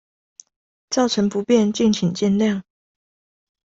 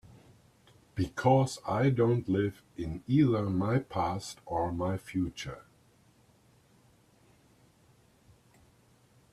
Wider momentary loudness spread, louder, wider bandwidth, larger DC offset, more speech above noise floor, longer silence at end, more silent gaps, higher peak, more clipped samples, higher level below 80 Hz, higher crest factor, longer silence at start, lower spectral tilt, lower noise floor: second, 5 LU vs 14 LU; first, -20 LUFS vs -30 LUFS; second, 8 kHz vs 13 kHz; neither; first, over 72 dB vs 34 dB; second, 1.1 s vs 3.7 s; neither; first, -4 dBFS vs -12 dBFS; neither; about the same, -58 dBFS vs -58 dBFS; second, 16 dB vs 22 dB; about the same, 0.9 s vs 0.95 s; second, -5.5 dB/octave vs -7 dB/octave; first, under -90 dBFS vs -64 dBFS